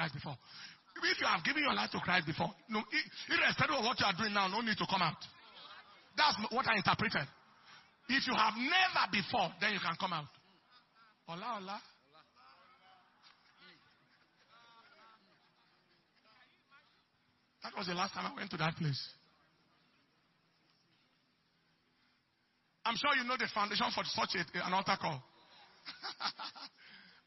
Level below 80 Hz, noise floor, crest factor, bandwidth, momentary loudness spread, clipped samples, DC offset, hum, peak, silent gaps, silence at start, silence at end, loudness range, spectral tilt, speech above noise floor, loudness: -74 dBFS; -77 dBFS; 26 dB; 6 kHz; 19 LU; under 0.1%; under 0.1%; none; -12 dBFS; none; 0 s; 0.25 s; 15 LU; -1.5 dB/octave; 41 dB; -34 LUFS